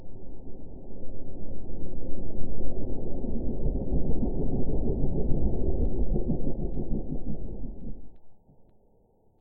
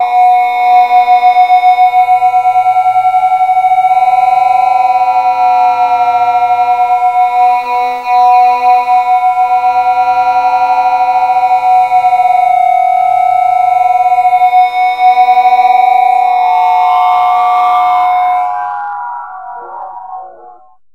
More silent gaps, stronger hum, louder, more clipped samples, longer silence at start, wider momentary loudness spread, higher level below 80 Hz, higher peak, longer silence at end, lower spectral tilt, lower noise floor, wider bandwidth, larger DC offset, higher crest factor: neither; neither; second, -33 LUFS vs -9 LUFS; neither; about the same, 0 s vs 0 s; first, 15 LU vs 6 LU; first, -32 dBFS vs -56 dBFS; second, -10 dBFS vs 0 dBFS; first, 1.05 s vs 0.4 s; first, -15 dB/octave vs -2.5 dB/octave; first, -62 dBFS vs -38 dBFS; second, 1 kHz vs 6.8 kHz; second, under 0.1% vs 0.3%; about the same, 12 dB vs 8 dB